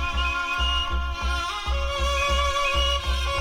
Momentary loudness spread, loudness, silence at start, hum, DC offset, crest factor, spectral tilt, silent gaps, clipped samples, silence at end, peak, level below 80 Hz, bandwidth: 5 LU; -24 LUFS; 0 s; none; under 0.1%; 12 dB; -3 dB/octave; none; under 0.1%; 0 s; -12 dBFS; -28 dBFS; 15.5 kHz